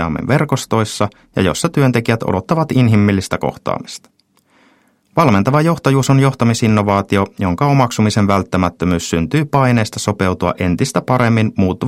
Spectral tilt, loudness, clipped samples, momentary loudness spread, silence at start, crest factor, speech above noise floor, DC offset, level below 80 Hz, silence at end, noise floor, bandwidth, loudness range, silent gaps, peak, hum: -6 dB/octave; -15 LUFS; under 0.1%; 7 LU; 0 s; 14 dB; 41 dB; under 0.1%; -42 dBFS; 0 s; -55 dBFS; 15.5 kHz; 3 LU; none; 0 dBFS; none